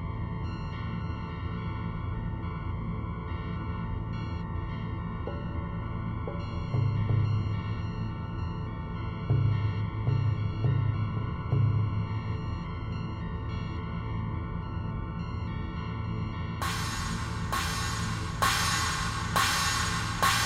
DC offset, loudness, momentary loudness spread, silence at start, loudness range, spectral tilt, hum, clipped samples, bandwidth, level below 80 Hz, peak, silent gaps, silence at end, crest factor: under 0.1%; -31 LUFS; 9 LU; 0 s; 6 LU; -4.5 dB/octave; none; under 0.1%; 16 kHz; -40 dBFS; -12 dBFS; none; 0 s; 18 dB